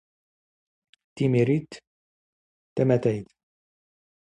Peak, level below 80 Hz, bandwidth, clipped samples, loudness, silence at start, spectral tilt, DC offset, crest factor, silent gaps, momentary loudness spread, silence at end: -8 dBFS; -64 dBFS; 9.6 kHz; under 0.1%; -25 LUFS; 1.15 s; -8.5 dB/octave; under 0.1%; 20 dB; 1.87-2.76 s; 17 LU; 1.05 s